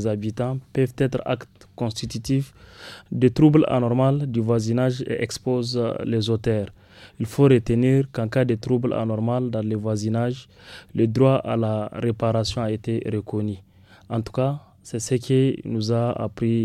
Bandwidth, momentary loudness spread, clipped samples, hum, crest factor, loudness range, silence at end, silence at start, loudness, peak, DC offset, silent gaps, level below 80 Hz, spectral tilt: 13 kHz; 12 LU; under 0.1%; none; 18 dB; 4 LU; 0 s; 0 s; -23 LUFS; -4 dBFS; under 0.1%; none; -50 dBFS; -7 dB/octave